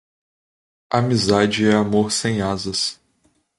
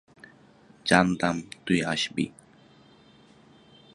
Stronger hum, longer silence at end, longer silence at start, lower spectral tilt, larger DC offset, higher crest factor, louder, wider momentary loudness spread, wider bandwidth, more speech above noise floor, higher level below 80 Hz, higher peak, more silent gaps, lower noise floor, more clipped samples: neither; second, 0.65 s vs 1.65 s; about the same, 0.9 s vs 0.85 s; about the same, -4.5 dB/octave vs -4.5 dB/octave; neither; second, 18 dB vs 26 dB; first, -19 LUFS vs -26 LUFS; second, 6 LU vs 12 LU; about the same, 11.5 kHz vs 11.5 kHz; first, 45 dB vs 31 dB; first, -50 dBFS vs -58 dBFS; about the same, -2 dBFS vs -2 dBFS; neither; first, -64 dBFS vs -56 dBFS; neither